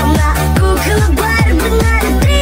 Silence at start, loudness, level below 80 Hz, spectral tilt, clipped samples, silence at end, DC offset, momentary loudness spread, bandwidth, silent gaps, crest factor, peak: 0 s; -12 LUFS; -14 dBFS; -5.5 dB/octave; under 0.1%; 0 s; under 0.1%; 1 LU; 16.5 kHz; none; 10 dB; 0 dBFS